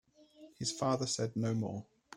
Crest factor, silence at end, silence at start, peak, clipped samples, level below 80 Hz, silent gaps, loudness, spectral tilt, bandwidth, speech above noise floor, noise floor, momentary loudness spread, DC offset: 18 dB; 0 s; 0.4 s; -20 dBFS; under 0.1%; -70 dBFS; none; -36 LUFS; -5 dB/octave; 12.5 kHz; 24 dB; -59 dBFS; 7 LU; under 0.1%